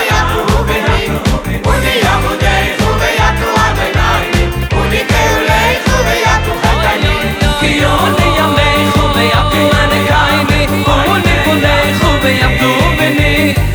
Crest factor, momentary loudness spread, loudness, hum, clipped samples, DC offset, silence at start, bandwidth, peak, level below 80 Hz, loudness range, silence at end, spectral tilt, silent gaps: 10 dB; 3 LU; -11 LUFS; none; under 0.1%; under 0.1%; 0 s; over 20 kHz; 0 dBFS; -18 dBFS; 2 LU; 0 s; -5 dB/octave; none